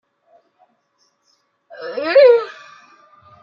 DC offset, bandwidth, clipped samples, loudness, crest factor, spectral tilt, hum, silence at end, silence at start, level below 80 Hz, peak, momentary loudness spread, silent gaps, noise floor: under 0.1%; 6 kHz; under 0.1%; -14 LUFS; 18 dB; -4 dB/octave; none; 0.9 s; 1.8 s; -76 dBFS; -2 dBFS; 22 LU; none; -64 dBFS